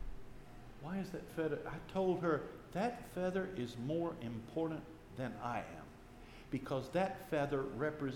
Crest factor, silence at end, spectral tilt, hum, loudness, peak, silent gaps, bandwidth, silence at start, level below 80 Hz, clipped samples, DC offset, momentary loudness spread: 16 dB; 0 s; -7 dB/octave; none; -40 LUFS; -24 dBFS; none; 17.5 kHz; 0 s; -58 dBFS; under 0.1%; under 0.1%; 18 LU